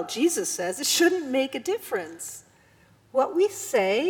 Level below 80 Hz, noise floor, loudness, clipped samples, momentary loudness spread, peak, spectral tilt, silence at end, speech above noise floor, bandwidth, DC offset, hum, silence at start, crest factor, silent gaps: -72 dBFS; -58 dBFS; -25 LUFS; under 0.1%; 14 LU; -8 dBFS; -2 dB/octave; 0 s; 33 dB; 20 kHz; under 0.1%; none; 0 s; 18 dB; none